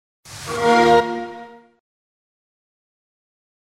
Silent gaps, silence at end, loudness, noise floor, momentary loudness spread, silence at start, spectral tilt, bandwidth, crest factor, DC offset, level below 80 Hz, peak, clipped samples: none; 2.25 s; -17 LUFS; -39 dBFS; 24 LU; 0.3 s; -4.5 dB/octave; 15 kHz; 20 dB; under 0.1%; -54 dBFS; -4 dBFS; under 0.1%